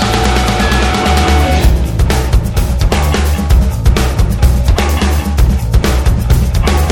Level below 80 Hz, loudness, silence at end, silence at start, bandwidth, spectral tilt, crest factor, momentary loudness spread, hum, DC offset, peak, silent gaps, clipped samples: -12 dBFS; -12 LUFS; 0 s; 0 s; 17 kHz; -5.5 dB/octave; 10 dB; 3 LU; none; under 0.1%; 0 dBFS; none; under 0.1%